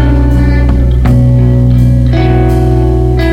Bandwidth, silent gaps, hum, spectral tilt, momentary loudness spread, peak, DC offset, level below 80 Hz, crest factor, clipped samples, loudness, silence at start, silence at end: 5.6 kHz; none; none; -9 dB/octave; 2 LU; 0 dBFS; under 0.1%; -10 dBFS; 6 dB; under 0.1%; -9 LUFS; 0 s; 0 s